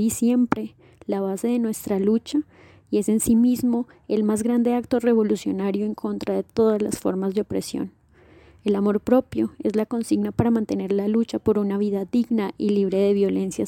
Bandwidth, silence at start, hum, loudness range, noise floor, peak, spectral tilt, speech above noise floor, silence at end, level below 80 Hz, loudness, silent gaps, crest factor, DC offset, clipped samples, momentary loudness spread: 17 kHz; 0 s; none; 3 LU; -52 dBFS; -4 dBFS; -6.5 dB/octave; 30 dB; 0 s; -54 dBFS; -23 LUFS; none; 18 dB; under 0.1%; under 0.1%; 7 LU